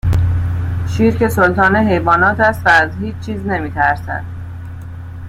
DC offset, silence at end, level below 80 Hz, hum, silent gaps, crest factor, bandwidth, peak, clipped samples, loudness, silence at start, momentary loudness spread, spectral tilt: under 0.1%; 0 s; -32 dBFS; none; none; 14 dB; 15 kHz; 0 dBFS; under 0.1%; -14 LUFS; 0.05 s; 18 LU; -7 dB/octave